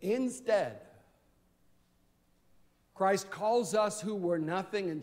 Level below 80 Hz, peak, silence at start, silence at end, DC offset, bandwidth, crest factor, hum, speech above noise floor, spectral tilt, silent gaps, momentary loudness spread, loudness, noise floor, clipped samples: -74 dBFS; -16 dBFS; 0 s; 0 s; under 0.1%; 16 kHz; 18 dB; none; 38 dB; -5 dB/octave; none; 5 LU; -32 LUFS; -70 dBFS; under 0.1%